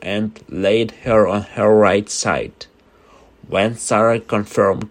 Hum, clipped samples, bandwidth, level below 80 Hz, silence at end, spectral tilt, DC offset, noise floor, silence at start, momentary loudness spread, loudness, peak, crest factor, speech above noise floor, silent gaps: none; under 0.1%; 15.5 kHz; -48 dBFS; 0.05 s; -5 dB/octave; under 0.1%; -50 dBFS; 0 s; 10 LU; -17 LUFS; 0 dBFS; 18 dB; 33 dB; none